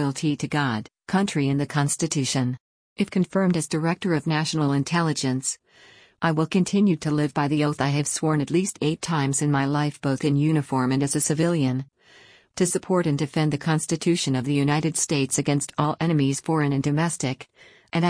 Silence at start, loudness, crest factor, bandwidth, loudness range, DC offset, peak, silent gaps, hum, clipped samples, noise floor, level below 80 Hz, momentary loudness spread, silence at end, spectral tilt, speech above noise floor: 0 s; -23 LUFS; 16 dB; 10.5 kHz; 1 LU; under 0.1%; -8 dBFS; 2.60-2.96 s; none; under 0.1%; -53 dBFS; -60 dBFS; 5 LU; 0 s; -5 dB/octave; 30 dB